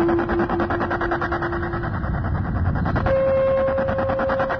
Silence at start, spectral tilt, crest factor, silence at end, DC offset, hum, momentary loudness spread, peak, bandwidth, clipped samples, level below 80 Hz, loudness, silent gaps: 0 s; -9.5 dB/octave; 12 dB; 0 s; under 0.1%; none; 6 LU; -8 dBFS; 6.2 kHz; under 0.1%; -32 dBFS; -22 LUFS; none